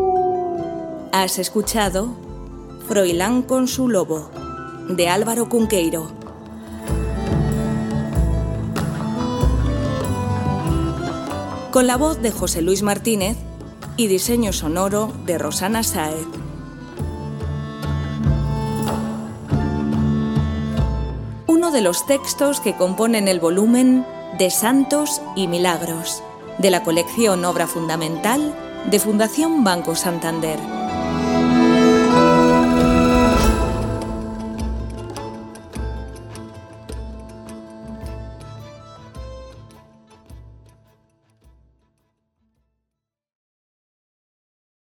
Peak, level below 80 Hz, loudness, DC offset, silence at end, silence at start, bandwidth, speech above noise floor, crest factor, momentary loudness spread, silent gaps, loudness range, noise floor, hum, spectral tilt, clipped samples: 0 dBFS; -32 dBFS; -19 LUFS; under 0.1%; 4.35 s; 0 s; 17.5 kHz; 64 dB; 20 dB; 19 LU; none; 15 LU; -82 dBFS; none; -5 dB/octave; under 0.1%